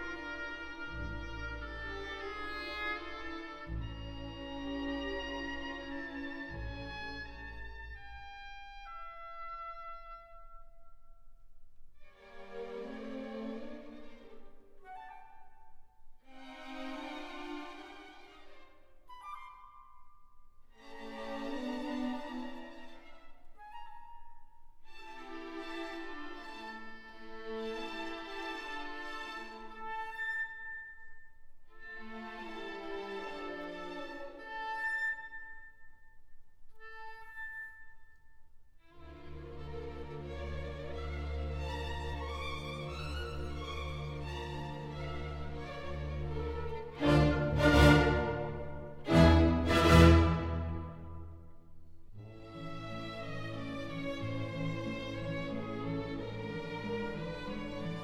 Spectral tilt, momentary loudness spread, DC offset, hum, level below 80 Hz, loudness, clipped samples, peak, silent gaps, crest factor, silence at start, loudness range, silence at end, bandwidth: -6.5 dB/octave; 21 LU; under 0.1%; none; -44 dBFS; -36 LUFS; under 0.1%; -8 dBFS; none; 28 dB; 0 s; 21 LU; 0 s; 15.5 kHz